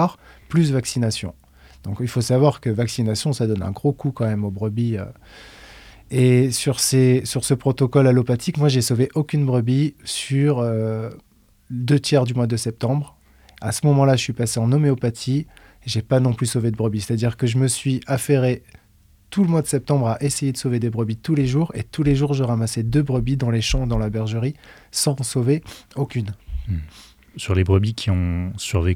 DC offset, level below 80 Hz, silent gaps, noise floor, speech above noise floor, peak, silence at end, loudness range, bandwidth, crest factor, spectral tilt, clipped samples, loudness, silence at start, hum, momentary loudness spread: under 0.1%; -40 dBFS; none; -54 dBFS; 34 dB; -2 dBFS; 0 s; 5 LU; 15.5 kHz; 18 dB; -6 dB/octave; under 0.1%; -21 LUFS; 0 s; none; 11 LU